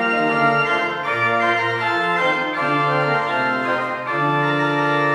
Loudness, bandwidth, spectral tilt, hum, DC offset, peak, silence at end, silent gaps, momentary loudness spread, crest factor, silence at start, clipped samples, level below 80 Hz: -19 LUFS; 13 kHz; -6 dB/octave; none; under 0.1%; -6 dBFS; 0 s; none; 4 LU; 14 dB; 0 s; under 0.1%; -68 dBFS